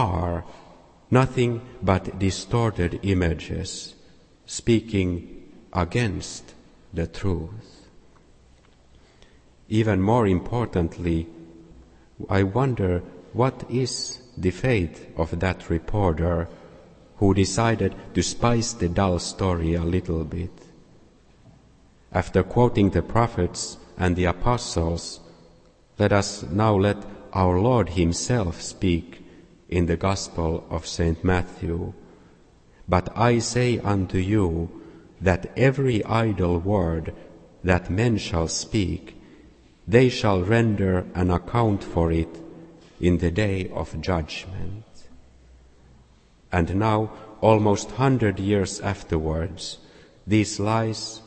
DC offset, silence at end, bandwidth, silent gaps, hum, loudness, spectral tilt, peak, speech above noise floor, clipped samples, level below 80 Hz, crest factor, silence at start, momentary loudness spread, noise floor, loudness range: under 0.1%; 0.05 s; 8.8 kHz; none; none; -24 LUFS; -6 dB/octave; -2 dBFS; 32 dB; under 0.1%; -40 dBFS; 22 dB; 0 s; 12 LU; -55 dBFS; 5 LU